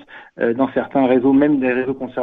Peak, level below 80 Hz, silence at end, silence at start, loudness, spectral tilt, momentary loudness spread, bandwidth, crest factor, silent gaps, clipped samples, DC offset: -4 dBFS; -54 dBFS; 0 s; 0.1 s; -17 LUFS; -10 dB/octave; 8 LU; 3.9 kHz; 14 dB; none; under 0.1%; under 0.1%